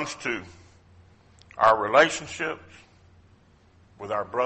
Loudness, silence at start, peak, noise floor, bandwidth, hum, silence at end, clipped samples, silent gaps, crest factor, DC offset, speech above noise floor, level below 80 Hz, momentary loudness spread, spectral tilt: -24 LUFS; 0 s; -6 dBFS; -57 dBFS; 8.4 kHz; none; 0 s; under 0.1%; none; 22 dB; under 0.1%; 33 dB; -60 dBFS; 20 LU; -3 dB/octave